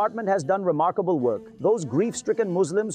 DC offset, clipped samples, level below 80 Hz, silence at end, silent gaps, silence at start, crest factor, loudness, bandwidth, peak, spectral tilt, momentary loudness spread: under 0.1%; under 0.1%; -70 dBFS; 0 s; none; 0 s; 12 dB; -24 LUFS; 10 kHz; -12 dBFS; -6 dB/octave; 3 LU